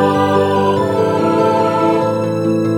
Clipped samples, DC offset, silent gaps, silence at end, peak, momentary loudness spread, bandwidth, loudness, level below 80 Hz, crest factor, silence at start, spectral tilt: under 0.1%; under 0.1%; none; 0 s; 0 dBFS; 3 LU; 16.5 kHz; -14 LUFS; -58 dBFS; 12 dB; 0 s; -7 dB/octave